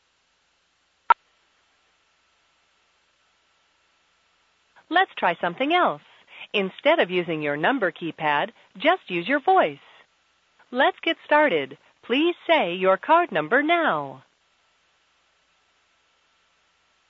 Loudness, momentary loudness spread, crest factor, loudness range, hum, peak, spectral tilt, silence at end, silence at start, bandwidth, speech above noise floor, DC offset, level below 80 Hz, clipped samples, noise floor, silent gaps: -22 LUFS; 8 LU; 24 dB; 10 LU; none; -2 dBFS; -6.5 dB/octave; 2.9 s; 1.1 s; 7.4 kHz; 45 dB; under 0.1%; -80 dBFS; under 0.1%; -68 dBFS; none